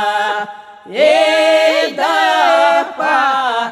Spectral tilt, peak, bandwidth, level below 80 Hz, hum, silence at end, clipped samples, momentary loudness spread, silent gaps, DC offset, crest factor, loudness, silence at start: -1.5 dB/octave; -2 dBFS; 14 kHz; -68 dBFS; none; 0 s; under 0.1%; 8 LU; none; under 0.1%; 12 dB; -13 LUFS; 0 s